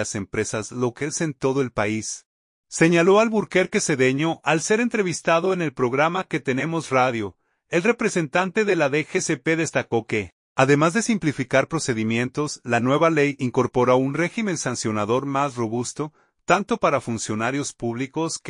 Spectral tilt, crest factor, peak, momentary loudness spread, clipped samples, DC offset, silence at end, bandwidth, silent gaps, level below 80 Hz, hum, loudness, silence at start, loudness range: -5 dB/octave; 20 dB; -2 dBFS; 8 LU; under 0.1%; under 0.1%; 0 s; 11 kHz; 2.25-2.64 s, 10.32-10.55 s; -60 dBFS; none; -22 LUFS; 0 s; 3 LU